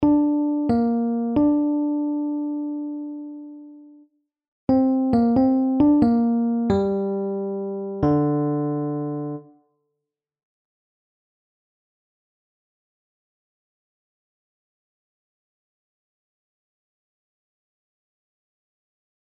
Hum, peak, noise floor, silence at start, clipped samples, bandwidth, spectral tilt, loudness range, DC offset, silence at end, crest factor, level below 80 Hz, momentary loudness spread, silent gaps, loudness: none; -8 dBFS; -84 dBFS; 0 s; under 0.1%; 5.2 kHz; -10.5 dB/octave; 9 LU; under 0.1%; 9.95 s; 16 dB; -52 dBFS; 13 LU; 4.48-4.67 s; -22 LUFS